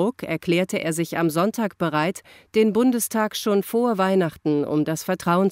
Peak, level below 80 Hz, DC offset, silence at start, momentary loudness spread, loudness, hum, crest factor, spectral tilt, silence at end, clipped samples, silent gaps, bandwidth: -8 dBFS; -62 dBFS; under 0.1%; 0 s; 5 LU; -22 LUFS; none; 14 dB; -5.5 dB/octave; 0 s; under 0.1%; none; 16 kHz